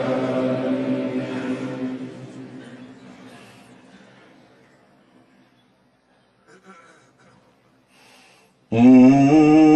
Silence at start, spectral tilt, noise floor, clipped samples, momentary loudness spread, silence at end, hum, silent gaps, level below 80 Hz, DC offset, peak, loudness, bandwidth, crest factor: 0 s; -8 dB/octave; -60 dBFS; under 0.1%; 27 LU; 0 s; none; none; -58 dBFS; under 0.1%; -4 dBFS; -17 LUFS; 8.4 kHz; 18 dB